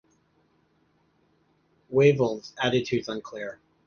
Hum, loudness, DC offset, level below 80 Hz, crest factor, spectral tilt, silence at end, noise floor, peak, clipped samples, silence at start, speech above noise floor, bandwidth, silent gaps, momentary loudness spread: none; -25 LUFS; under 0.1%; -64 dBFS; 22 dB; -6 dB/octave; 0.3 s; -67 dBFS; -6 dBFS; under 0.1%; 1.9 s; 42 dB; 7 kHz; none; 16 LU